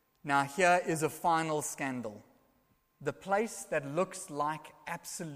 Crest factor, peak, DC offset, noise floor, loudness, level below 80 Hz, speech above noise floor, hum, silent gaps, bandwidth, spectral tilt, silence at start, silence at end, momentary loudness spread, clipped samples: 22 dB; -12 dBFS; under 0.1%; -72 dBFS; -33 LUFS; -72 dBFS; 39 dB; none; none; 15.5 kHz; -4 dB/octave; 0.25 s; 0 s; 14 LU; under 0.1%